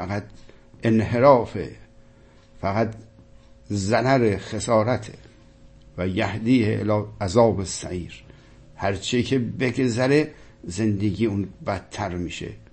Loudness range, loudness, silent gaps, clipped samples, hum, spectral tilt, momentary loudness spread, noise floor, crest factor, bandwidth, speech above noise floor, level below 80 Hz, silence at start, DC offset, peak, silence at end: 2 LU; -23 LUFS; none; under 0.1%; none; -6 dB/octave; 14 LU; -51 dBFS; 22 dB; 8.8 kHz; 29 dB; -48 dBFS; 0 s; under 0.1%; -2 dBFS; 0.15 s